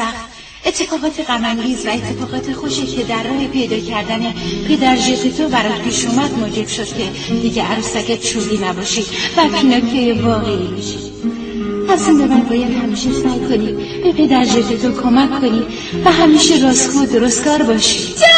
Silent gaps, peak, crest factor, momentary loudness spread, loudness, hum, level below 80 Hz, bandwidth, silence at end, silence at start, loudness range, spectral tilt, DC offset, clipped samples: none; 0 dBFS; 14 dB; 10 LU; -15 LUFS; none; -38 dBFS; 9.2 kHz; 0 s; 0 s; 6 LU; -3.5 dB/octave; under 0.1%; under 0.1%